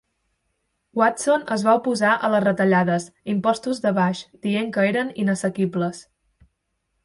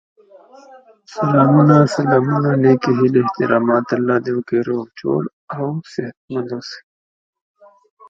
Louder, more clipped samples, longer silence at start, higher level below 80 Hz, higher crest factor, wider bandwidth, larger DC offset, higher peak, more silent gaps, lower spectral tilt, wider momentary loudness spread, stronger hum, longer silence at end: second, -21 LUFS vs -16 LUFS; neither; first, 0.95 s vs 0.7 s; about the same, -64 dBFS vs -62 dBFS; about the same, 18 dB vs 18 dB; first, 11.5 kHz vs 7.8 kHz; neither; second, -4 dBFS vs 0 dBFS; second, none vs 5.33-5.48 s, 6.17-6.28 s; second, -5.5 dB/octave vs -8 dB/octave; second, 8 LU vs 16 LU; neither; second, 1.05 s vs 1.3 s